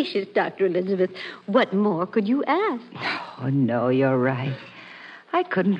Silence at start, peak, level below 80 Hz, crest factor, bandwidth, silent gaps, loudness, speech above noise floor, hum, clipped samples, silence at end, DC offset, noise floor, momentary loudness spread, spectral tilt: 0 s; -6 dBFS; -74 dBFS; 16 dB; 7.6 kHz; none; -23 LUFS; 20 dB; none; under 0.1%; 0 s; under 0.1%; -43 dBFS; 13 LU; -8.5 dB/octave